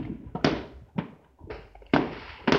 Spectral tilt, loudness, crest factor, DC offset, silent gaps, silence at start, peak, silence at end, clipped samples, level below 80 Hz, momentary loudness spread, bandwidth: -6 dB/octave; -30 LUFS; 26 dB; under 0.1%; none; 0 s; -4 dBFS; 0 s; under 0.1%; -50 dBFS; 17 LU; 7.6 kHz